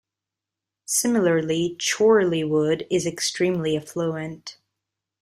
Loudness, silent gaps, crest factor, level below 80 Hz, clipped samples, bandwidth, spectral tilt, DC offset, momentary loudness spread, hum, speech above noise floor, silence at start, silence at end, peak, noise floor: -22 LUFS; none; 16 dB; -64 dBFS; under 0.1%; 15.5 kHz; -4 dB/octave; under 0.1%; 14 LU; none; 65 dB; 0.9 s; 0.7 s; -6 dBFS; -87 dBFS